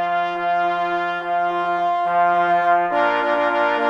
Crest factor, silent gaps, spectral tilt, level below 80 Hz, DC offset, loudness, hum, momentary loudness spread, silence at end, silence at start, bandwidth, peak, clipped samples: 14 dB; none; -5.5 dB/octave; -68 dBFS; under 0.1%; -19 LUFS; none; 4 LU; 0 s; 0 s; 7.4 kHz; -4 dBFS; under 0.1%